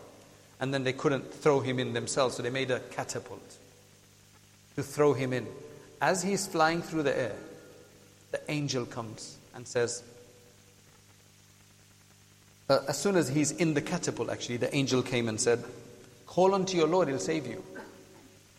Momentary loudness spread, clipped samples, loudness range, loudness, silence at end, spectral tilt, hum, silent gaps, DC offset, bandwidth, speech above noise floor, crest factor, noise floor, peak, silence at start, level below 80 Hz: 18 LU; under 0.1%; 8 LU; -30 LUFS; 0.4 s; -4.5 dB/octave; 50 Hz at -60 dBFS; none; under 0.1%; 15.5 kHz; 29 dB; 22 dB; -59 dBFS; -10 dBFS; 0 s; -66 dBFS